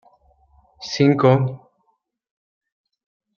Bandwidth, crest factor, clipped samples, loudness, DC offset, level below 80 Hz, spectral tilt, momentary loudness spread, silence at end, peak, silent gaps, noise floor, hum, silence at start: 7 kHz; 20 dB; under 0.1%; -18 LUFS; under 0.1%; -62 dBFS; -7 dB/octave; 21 LU; 1.8 s; -2 dBFS; none; -69 dBFS; none; 0.8 s